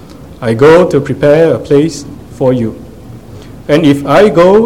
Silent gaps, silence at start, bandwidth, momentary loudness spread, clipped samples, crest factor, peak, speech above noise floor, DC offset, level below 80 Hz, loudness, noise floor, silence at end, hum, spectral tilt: none; 0.1 s; 15.5 kHz; 16 LU; 2%; 10 dB; 0 dBFS; 23 dB; 0.8%; -36 dBFS; -9 LUFS; -30 dBFS; 0 s; none; -7 dB/octave